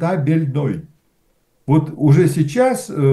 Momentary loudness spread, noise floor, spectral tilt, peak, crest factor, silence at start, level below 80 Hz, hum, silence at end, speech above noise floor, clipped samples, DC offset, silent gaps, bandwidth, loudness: 10 LU; -61 dBFS; -8 dB/octave; -4 dBFS; 12 dB; 0 s; -54 dBFS; none; 0 s; 46 dB; under 0.1%; under 0.1%; none; 12.5 kHz; -17 LUFS